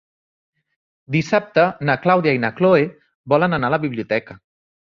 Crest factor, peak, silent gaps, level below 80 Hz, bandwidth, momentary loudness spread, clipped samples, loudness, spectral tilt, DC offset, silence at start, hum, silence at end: 18 dB; -2 dBFS; 3.15-3.24 s; -56 dBFS; 7.4 kHz; 7 LU; under 0.1%; -18 LUFS; -7 dB/octave; under 0.1%; 1.1 s; none; 0.6 s